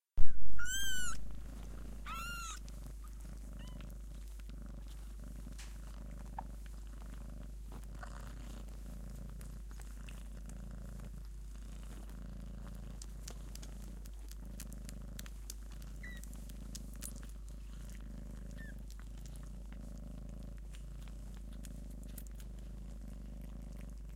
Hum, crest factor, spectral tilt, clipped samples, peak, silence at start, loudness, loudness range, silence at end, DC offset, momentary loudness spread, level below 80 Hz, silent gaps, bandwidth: none; 24 dB; -3.5 dB/octave; under 0.1%; -10 dBFS; 0.15 s; -48 LUFS; 3 LU; 0 s; under 0.1%; 6 LU; -46 dBFS; none; 16 kHz